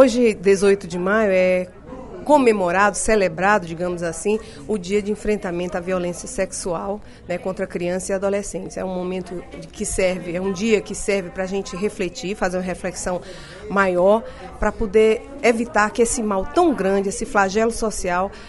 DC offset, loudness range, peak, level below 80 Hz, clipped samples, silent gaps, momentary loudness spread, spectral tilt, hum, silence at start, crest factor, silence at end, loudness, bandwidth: under 0.1%; 6 LU; 0 dBFS; -40 dBFS; under 0.1%; none; 11 LU; -4.5 dB/octave; none; 0 s; 20 dB; 0 s; -21 LUFS; 11.5 kHz